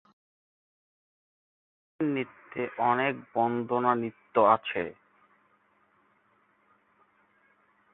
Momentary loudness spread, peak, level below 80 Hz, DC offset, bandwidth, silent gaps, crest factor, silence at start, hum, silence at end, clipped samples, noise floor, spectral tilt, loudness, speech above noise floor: 12 LU; -8 dBFS; -74 dBFS; under 0.1%; 4.1 kHz; none; 24 dB; 2 s; none; 3 s; under 0.1%; -68 dBFS; -9.5 dB/octave; -28 LUFS; 41 dB